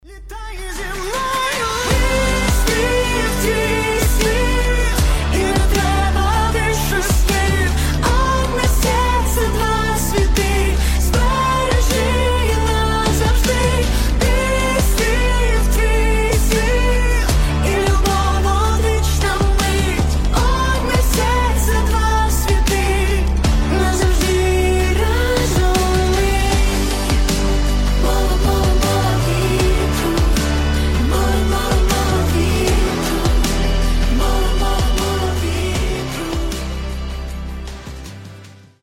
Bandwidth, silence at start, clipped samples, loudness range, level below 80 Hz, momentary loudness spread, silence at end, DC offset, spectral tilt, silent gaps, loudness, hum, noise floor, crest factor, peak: 16.5 kHz; 0.05 s; under 0.1%; 2 LU; -18 dBFS; 4 LU; 0.35 s; under 0.1%; -4.5 dB/octave; none; -17 LUFS; none; -40 dBFS; 14 dB; 0 dBFS